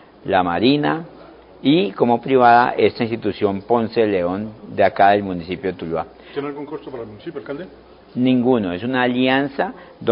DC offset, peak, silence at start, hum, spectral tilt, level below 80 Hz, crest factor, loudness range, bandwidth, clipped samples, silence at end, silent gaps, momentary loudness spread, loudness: under 0.1%; 0 dBFS; 0.25 s; none; -11 dB/octave; -50 dBFS; 18 dB; 6 LU; 5.4 kHz; under 0.1%; 0 s; none; 17 LU; -18 LUFS